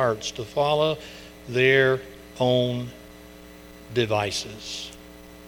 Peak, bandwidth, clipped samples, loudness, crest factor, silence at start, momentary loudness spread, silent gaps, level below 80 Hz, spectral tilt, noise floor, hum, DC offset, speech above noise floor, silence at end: -4 dBFS; 19 kHz; under 0.1%; -24 LUFS; 22 dB; 0 s; 26 LU; none; -52 dBFS; -4.5 dB/octave; -45 dBFS; none; under 0.1%; 21 dB; 0 s